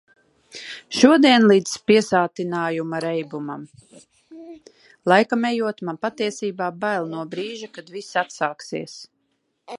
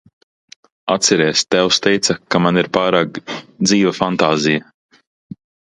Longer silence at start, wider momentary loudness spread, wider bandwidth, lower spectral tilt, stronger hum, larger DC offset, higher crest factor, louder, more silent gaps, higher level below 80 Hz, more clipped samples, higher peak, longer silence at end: second, 0.55 s vs 0.85 s; first, 21 LU vs 8 LU; about the same, 11.5 kHz vs 11.5 kHz; about the same, -4.5 dB/octave vs -3.5 dB/octave; neither; neither; about the same, 22 dB vs 18 dB; second, -21 LUFS vs -15 LUFS; neither; second, -68 dBFS vs -56 dBFS; neither; about the same, 0 dBFS vs 0 dBFS; second, 0 s vs 1.15 s